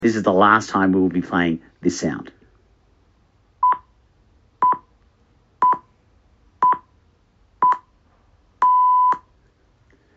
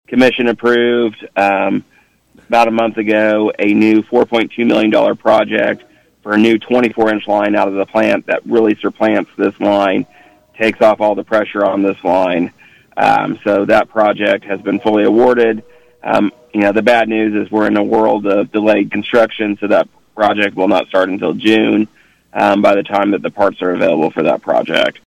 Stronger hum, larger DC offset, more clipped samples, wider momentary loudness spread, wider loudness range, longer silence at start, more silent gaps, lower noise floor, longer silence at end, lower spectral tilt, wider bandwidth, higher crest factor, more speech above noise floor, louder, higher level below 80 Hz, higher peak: neither; neither; neither; first, 11 LU vs 5 LU; first, 5 LU vs 1 LU; about the same, 0 s vs 0.1 s; neither; first, -58 dBFS vs -49 dBFS; first, 1 s vs 0.2 s; second, -4.5 dB/octave vs -6 dB/octave; second, 8 kHz vs 11.5 kHz; first, 22 dB vs 12 dB; about the same, 40 dB vs 37 dB; second, -19 LUFS vs -13 LUFS; about the same, -58 dBFS vs -54 dBFS; about the same, 0 dBFS vs -2 dBFS